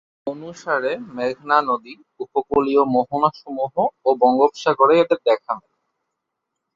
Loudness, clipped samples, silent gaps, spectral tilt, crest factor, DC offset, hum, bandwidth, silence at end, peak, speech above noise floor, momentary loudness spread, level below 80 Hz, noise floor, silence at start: -19 LUFS; under 0.1%; none; -6 dB/octave; 18 dB; under 0.1%; none; 7.6 kHz; 1.15 s; -2 dBFS; 60 dB; 14 LU; -60 dBFS; -79 dBFS; 0.25 s